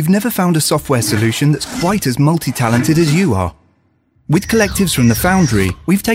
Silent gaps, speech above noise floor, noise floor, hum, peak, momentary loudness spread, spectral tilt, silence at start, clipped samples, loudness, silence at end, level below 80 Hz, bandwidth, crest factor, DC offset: none; 44 dB; -57 dBFS; none; 0 dBFS; 4 LU; -5 dB/octave; 0 s; under 0.1%; -14 LUFS; 0 s; -36 dBFS; 16 kHz; 14 dB; under 0.1%